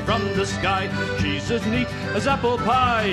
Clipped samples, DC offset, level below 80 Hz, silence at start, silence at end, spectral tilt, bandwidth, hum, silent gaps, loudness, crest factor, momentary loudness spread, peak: under 0.1%; under 0.1%; -38 dBFS; 0 s; 0 s; -5 dB/octave; 13.5 kHz; none; none; -22 LUFS; 16 dB; 5 LU; -6 dBFS